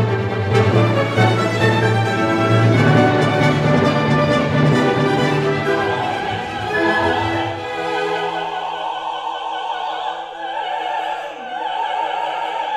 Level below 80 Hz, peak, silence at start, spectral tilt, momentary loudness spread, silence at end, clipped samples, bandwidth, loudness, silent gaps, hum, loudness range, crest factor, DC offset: -50 dBFS; 0 dBFS; 0 s; -6.5 dB/octave; 10 LU; 0 s; under 0.1%; 12 kHz; -18 LUFS; none; none; 8 LU; 16 dB; under 0.1%